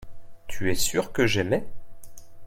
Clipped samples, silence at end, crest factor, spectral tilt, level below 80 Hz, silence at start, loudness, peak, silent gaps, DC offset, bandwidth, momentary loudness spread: under 0.1%; 0 s; 16 dB; -4 dB/octave; -42 dBFS; 0 s; -25 LUFS; -8 dBFS; none; under 0.1%; 16.5 kHz; 7 LU